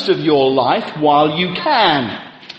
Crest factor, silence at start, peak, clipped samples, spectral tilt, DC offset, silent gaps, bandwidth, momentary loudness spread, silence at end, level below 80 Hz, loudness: 14 dB; 0 s; 0 dBFS; under 0.1%; -6.5 dB/octave; under 0.1%; none; 8.2 kHz; 6 LU; 0 s; -56 dBFS; -14 LUFS